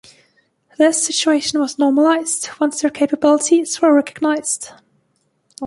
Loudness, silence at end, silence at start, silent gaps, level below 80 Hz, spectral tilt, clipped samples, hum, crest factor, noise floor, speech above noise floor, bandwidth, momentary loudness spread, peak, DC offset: -16 LUFS; 0 s; 0.8 s; none; -66 dBFS; -1.5 dB/octave; under 0.1%; none; 16 dB; -65 dBFS; 49 dB; 11.5 kHz; 6 LU; 0 dBFS; under 0.1%